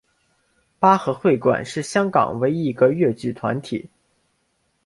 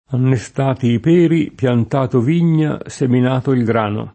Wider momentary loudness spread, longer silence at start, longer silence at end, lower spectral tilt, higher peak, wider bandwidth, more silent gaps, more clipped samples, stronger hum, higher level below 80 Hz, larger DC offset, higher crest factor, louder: first, 9 LU vs 5 LU; first, 0.8 s vs 0.1 s; first, 1.05 s vs 0.05 s; second, -6.5 dB/octave vs -8 dB/octave; about the same, -2 dBFS vs -2 dBFS; first, 11.5 kHz vs 8.8 kHz; neither; neither; neither; second, -60 dBFS vs -52 dBFS; neither; first, 20 dB vs 14 dB; second, -20 LUFS vs -16 LUFS